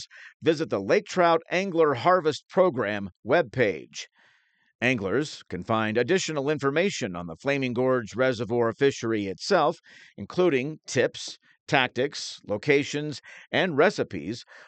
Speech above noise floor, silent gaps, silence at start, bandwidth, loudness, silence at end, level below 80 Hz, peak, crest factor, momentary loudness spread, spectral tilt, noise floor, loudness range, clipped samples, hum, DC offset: 39 dB; 0.34-0.40 s, 3.16-3.23 s, 4.75-4.79 s, 11.60-11.66 s; 0 s; 9 kHz; -25 LUFS; 0.05 s; -70 dBFS; -6 dBFS; 20 dB; 13 LU; -5 dB/octave; -65 dBFS; 3 LU; under 0.1%; none; under 0.1%